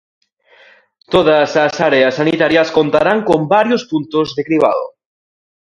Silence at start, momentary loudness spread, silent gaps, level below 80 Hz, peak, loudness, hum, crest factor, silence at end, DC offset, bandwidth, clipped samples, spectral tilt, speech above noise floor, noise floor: 1.1 s; 6 LU; none; -50 dBFS; 0 dBFS; -13 LUFS; none; 14 dB; 0.8 s; under 0.1%; 11 kHz; under 0.1%; -5.5 dB/octave; 35 dB; -48 dBFS